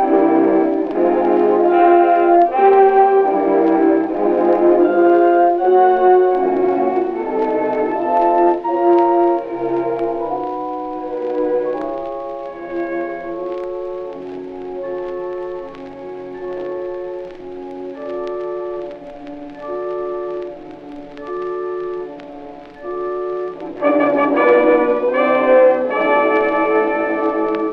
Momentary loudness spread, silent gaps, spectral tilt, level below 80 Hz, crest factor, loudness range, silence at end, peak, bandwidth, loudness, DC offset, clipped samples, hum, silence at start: 18 LU; none; -8 dB/octave; -52 dBFS; 16 dB; 14 LU; 0 s; -2 dBFS; 4.9 kHz; -16 LUFS; under 0.1%; under 0.1%; none; 0 s